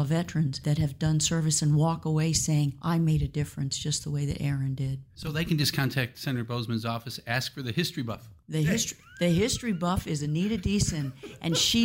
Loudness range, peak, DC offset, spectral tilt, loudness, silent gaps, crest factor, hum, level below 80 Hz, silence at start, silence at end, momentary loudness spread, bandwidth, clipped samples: 4 LU; -12 dBFS; under 0.1%; -4.5 dB/octave; -28 LUFS; none; 16 dB; none; -46 dBFS; 0 s; 0 s; 8 LU; 16 kHz; under 0.1%